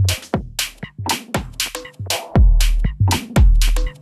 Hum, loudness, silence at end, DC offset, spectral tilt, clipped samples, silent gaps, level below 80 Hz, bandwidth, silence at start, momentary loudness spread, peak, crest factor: none; -19 LUFS; 0.1 s; under 0.1%; -4.5 dB/octave; under 0.1%; none; -18 dBFS; 14.5 kHz; 0 s; 9 LU; -2 dBFS; 14 dB